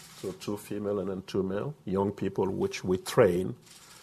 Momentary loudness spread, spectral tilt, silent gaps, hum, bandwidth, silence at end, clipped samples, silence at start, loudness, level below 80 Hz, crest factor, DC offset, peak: 13 LU; -6 dB/octave; none; none; 14 kHz; 0.05 s; under 0.1%; 0 s; -30 LUFS; -56 dBFS; 22 dB; under 0.1%; -8 dBFS